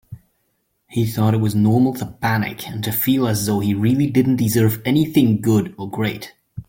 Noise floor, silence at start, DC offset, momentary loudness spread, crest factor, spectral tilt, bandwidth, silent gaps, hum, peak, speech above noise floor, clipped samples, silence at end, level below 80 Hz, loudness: -69 dBFS; 0.1 s; under 0.1%; 9 LU; 16 dB; -6.5 dB/octave; 17 kHz; none; none; -2 dBFS; 51 dB; under 0.1%; 0.05 s; -50 dBFS; -19 LUFS